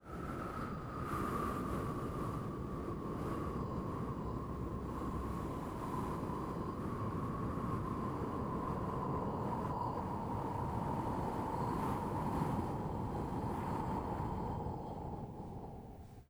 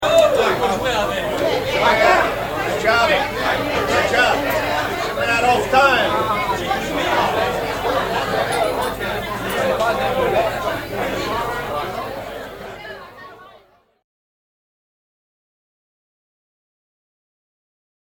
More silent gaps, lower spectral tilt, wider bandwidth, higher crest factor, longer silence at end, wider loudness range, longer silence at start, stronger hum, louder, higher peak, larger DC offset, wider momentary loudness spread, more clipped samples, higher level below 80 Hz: neither; first, -8 dB/octave vs -4 dB/octave; about the same, over 20 kHz vs 19.5 kHz; about the same, 16 dB vs 20 dB; second, 0.05 s vs 4.6 s; second, 3 LU vs 11 LU; about the same, 0 s vs 0 s; neither; second, -40 LUFS vs -18 LUFS; second, -24 dBFS vs 0 dBFS; neither; second, 5 LU vs 10 LU; neither; second, -50 dBFS vs -42 dBFS